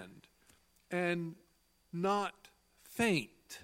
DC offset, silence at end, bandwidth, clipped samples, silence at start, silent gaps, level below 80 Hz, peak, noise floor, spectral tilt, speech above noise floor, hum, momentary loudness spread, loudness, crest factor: under 0.1%; 0 s; 16.5 kHz; under 0.1%; 0 s; none; -72 dBFS; -18 dBFS; -68 dBFS; -5 dB/octave; 34 dB; none; 15 LU; -36 LUFS; 20 dB